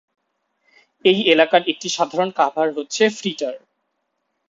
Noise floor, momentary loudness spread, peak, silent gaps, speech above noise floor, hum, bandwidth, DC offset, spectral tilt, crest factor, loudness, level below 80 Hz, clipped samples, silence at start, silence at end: -73 dBFS; 11 LU; 0 dBFS; none; 55 dB; none; 7.8 kHz; under 0.1%; -3.5 dB/octave; 20 dB; -19 LUFS; -68 dBFS; under 0.1%; 1.05 s; 0.9 s